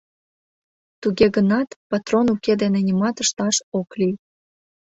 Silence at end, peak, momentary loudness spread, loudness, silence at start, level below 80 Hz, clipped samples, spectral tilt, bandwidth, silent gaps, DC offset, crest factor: 0.8 s; -2 dBFS; 9 LU; -20 LUFS; 1 s; -56 dBFS; under 0.1%; -4.5 dB/octave; 8.4 kHz; 1.76-1.90 s, 3.63-3.72 s; under 0.1%; 18 dB